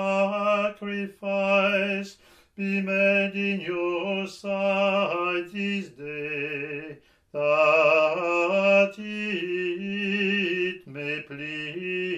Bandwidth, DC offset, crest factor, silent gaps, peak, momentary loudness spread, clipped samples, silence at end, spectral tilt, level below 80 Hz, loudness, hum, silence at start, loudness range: 9 kHz; under 0.1%; 18 dB; none; -8 dBFS; 12 LU; under 0.1%; 0 s; -6 dB/octave; -70 dBFS; -25 LUFS; none; 0 s; 5 LU